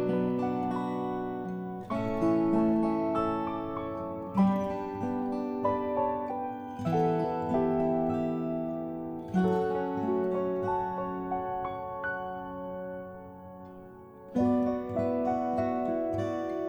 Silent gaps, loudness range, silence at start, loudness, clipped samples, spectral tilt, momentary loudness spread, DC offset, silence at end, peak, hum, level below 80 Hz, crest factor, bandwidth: none; 5 LU; 0 s; -31 LUFS; under 0.1%; -9 dB/octave; 11 LU; under 0.1%; 0 s; -14 dBFS; none; -58 dBFS; 16 dB; 8.8 kHz